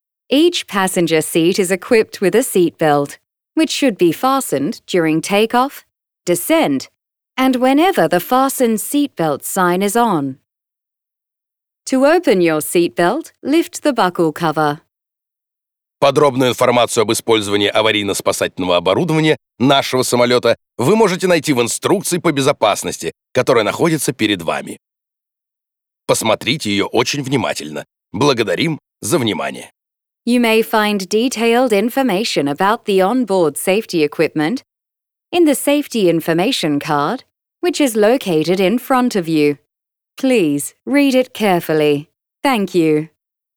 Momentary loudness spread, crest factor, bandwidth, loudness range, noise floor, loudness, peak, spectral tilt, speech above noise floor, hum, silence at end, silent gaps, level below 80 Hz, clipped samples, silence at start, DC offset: 7 LU; 14 dB; over 20 kHz; 4 LU; -84 dBFS; -15 LUFS; -2 dBFS; -4.5 dB/octave; 69 dB; none; 0.5 s; none; -60 dBFS; under 0.1%; 0.3 s; under 0.1%